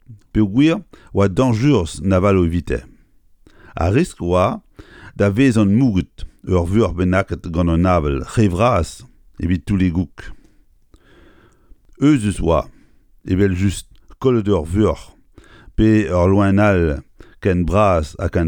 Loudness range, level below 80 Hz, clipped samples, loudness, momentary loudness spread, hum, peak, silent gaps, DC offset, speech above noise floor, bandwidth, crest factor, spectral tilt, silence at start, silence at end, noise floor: 4 LU; -32 dBFS; under 0.1%; -17 LUFS; 11 LU; none; -2 dBFS; none; under 0.1%; 35 dB; 11.5 kHz; 16 dB; -7.5 dB/octave; 0.1 s; 0 s; -51 dBFS